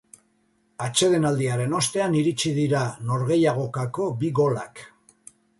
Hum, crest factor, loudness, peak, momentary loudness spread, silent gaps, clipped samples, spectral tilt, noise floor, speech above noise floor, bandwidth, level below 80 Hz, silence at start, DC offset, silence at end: none; 16 dB; -23 LUFS; -8 dBFS; 7 LU; none; under 0.1%; -5 dB/octave; -66 dBFS; 43 dB; 11.5 kHz; -62 dBFS; 0.8 s; under 0.1%; 0.7 s